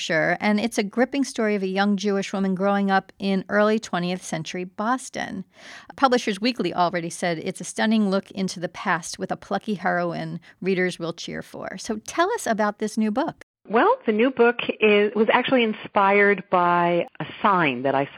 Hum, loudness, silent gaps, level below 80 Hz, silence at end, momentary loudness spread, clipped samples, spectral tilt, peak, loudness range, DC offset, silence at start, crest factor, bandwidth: none; -23 LUFS; 13.43-13.54 s; -66 dBFS; 0 s; 12 LU; under 0.1%; -5 dB/octave; -4 dBFS; 6 LU; under 0.1%; 0 s; 20 dB; 13.5 kHz